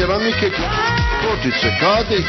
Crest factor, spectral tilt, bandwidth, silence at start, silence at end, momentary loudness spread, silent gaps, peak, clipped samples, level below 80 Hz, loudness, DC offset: 14 dB; -5 dB/octave; 6.2 kHz; 0 s; 0 s; 3 LU; none; -2 dBFS; under 0.1%; -28 dBFS; -17 LUFS; under 0.1%